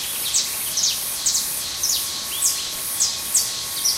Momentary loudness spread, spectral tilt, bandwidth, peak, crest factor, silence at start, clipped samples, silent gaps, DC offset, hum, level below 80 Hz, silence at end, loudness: 4 LU; 1.5 dB/octave; 16 kHz; -4 dBFS; 18 dB; 0 s; under 0.1%; none; under 0.1%; none; -54 dBFS; 0 s; -20 LUFS